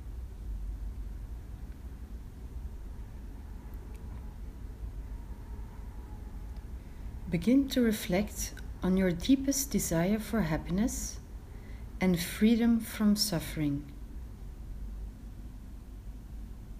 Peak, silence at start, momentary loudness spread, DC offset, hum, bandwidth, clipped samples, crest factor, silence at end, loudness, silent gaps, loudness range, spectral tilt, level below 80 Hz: -14 dBFS; 0 s; 19 LU; under 0.1%; none; 15.5 kHz; under 0.1%; 18 dB; 0 s; -30 LUFS; none; 15 LU; -5 dB/octave; -42 dBFS